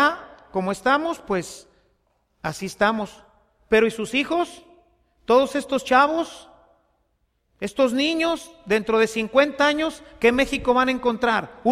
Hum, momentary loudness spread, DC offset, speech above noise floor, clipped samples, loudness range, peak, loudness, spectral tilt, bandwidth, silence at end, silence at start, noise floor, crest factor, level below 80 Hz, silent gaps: none; 12 LU; under 0.1%; 48 dB; under 0.1%; 4 LU; -4 dBFS; -22 LUFS; -4 dB/octave; 15 kHz; 0 s; 0 s; -70 dBFS; 20 dB; -52 dBFS; none